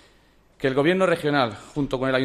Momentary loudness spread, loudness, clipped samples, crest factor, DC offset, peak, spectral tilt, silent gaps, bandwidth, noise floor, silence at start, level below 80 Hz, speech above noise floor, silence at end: 8 LU; -23 LUFS; under 0.1%; 16 dB; under 0.1%; -8 dBFS; -6 dB/octave; none; 13 kHz; -57 dBFS; 0.6 s; -52 dBFS; 35 dB; 0 s